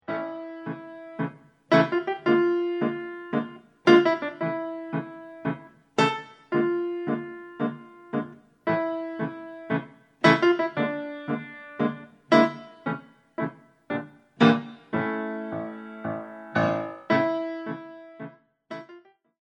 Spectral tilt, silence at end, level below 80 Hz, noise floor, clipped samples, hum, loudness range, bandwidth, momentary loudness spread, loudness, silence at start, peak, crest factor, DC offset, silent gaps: -6.5 dB/octave; 0.45 s; -74 dBFS; -52 dBFS; under 0.1%; none; 5 LU; 8.8 kHz; 19 LU; -26 LUFS; 0.1 s; -4 dBFS; 22 dB; under 0.1%; none